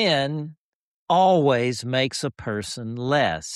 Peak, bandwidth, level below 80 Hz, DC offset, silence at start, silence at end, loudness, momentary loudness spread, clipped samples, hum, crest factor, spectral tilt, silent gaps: -8 dBFS; 13 kHz; -58 dBFS; under 0.1%; 0 s; 0 s; -22 LUFS; 12 LU; under 0.1%; none; 16 dB; -5 dB/octave; 0.58-1.07 s